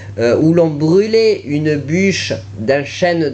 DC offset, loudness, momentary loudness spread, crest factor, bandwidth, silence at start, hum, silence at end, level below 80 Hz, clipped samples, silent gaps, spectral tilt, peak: under 0.1%; -14 LUFS; 6 LU; 12 dB; 8.6 kHz; 0 s; none; 0 s; -50 dBFS; under 0.1%; none; -6 dB/octave; -2 dBFS